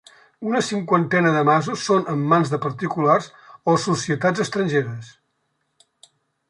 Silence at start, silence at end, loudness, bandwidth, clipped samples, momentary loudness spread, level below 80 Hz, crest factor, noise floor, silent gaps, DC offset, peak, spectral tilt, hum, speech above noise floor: 0.4 s; 1.4 s; -20 LUFS; 11.5 kHz; under 0.1%; 8 LU; -64 dBFS; 18 dB; -72 dBFS; none; under 0.1%; -4 dBFS; -5.5 dB/octave; none; 52 dB